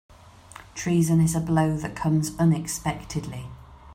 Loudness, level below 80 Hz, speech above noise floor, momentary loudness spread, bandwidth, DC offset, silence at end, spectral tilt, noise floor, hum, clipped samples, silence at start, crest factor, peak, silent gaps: -24 LUFS; -48 dBFS; 23 dB; 16 LU; 16 kHz; under 0.1%; 0 s; -6 dB/octave; -47 dBFS; none; under 0.1%; 0.55 s; 16 dB; -10 dBFS; none